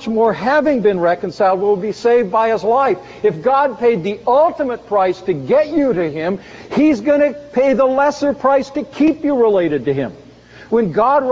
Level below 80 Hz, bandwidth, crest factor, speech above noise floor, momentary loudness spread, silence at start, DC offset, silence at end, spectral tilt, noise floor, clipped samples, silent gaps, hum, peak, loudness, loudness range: -50 dBFS; 7.6 kHz; 14 dB; 26 dB; 6 LU; 0 s; under 0.1%; 0 s; -7 dB/octave; -40 dBFS; under 0.1%; none; none; -2 dBFS; -16 LUFS; 1 LU